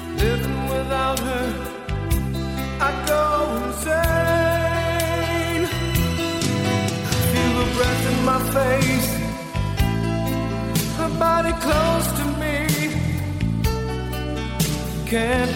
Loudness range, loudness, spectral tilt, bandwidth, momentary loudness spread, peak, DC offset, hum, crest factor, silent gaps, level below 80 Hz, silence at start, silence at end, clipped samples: 2 LU; -22 LUFS; -5 dB/octave; 17 kHz; 7 LU; -6 dBFS; under 0.1%; none; 14 dB; none; -32 dBFS; 0 s; 0 s; under 0.1%